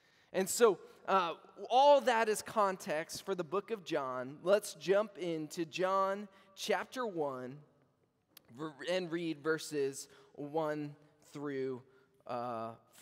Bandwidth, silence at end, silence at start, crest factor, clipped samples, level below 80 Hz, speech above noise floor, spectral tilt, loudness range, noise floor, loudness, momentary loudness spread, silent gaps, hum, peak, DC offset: 16 kHz; 0.25 s; 0.35 s; 20 dB; under 0.1%; -84 dBFS; 40 dB; -4 dB/octave; 9 LU; -75 dBFS; -35 LUFS; 17 LU; none; none; -16 dBFS; under 0.1%